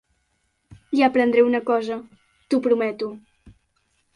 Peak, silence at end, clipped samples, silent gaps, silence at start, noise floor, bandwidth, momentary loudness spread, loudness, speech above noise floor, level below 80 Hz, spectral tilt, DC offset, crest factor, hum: -6 dBFS; 0.65 s; under 0.1%; none; 0.7 s; -70 dBFS; 11 kHz; 14 LU; -21 LUFS; 50 dB; -62 dBFS; -6 dB/octave; under 0.1%; 18 dB; none